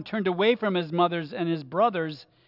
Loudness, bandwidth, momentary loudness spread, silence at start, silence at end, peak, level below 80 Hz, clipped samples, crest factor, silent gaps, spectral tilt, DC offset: -26 LUFS; 5.8 kHz; 6 LU; 0 s; 0.25 s; -10 dBFS; -76 dBFS; under 0.1%; 16 dB; none; -8.5 dB/octave; under 0.1%